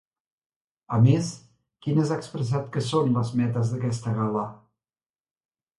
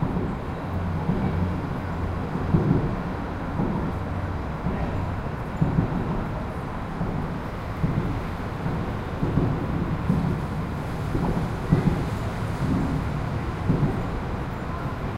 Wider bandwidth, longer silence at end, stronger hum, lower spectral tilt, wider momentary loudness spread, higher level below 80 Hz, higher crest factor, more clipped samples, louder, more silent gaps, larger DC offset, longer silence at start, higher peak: second, 11.5 kHz vs 15 kHz; first, 1.25 s vs 0 s; neither; about the same, -7.5 dB/octave vs -8.5 dB/octave; first, 11 LU vs 7 LU; second, -60 dBFS vs -34 dBFS; about the same, 18 dB vs 20 dB; neither; about the same, -25 LUFS vs -27 LUFS; neither; neither; first, 0.9 s vs 0 s; about the same, -8 dBFS vs -6 dBFS